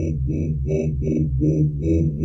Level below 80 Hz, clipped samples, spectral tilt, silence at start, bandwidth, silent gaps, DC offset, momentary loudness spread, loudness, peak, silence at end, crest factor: -30 dBFS; under 0.1%; -10.5 dB/octave; 0 s; 6.4 kHz; none; under 0.1%; 4 LU; -22 LUFS; -8 dBFS; 0 s; 12 dB